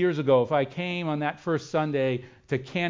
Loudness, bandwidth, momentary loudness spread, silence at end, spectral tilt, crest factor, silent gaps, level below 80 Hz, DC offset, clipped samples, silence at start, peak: -27 LUFS; 7.6 kHz; 9 LU; 0 s; -7 dB/octave; 16 dB; none; -64 dBFS; under 0.1%; under 0.1%; 0 s; -10 dBFS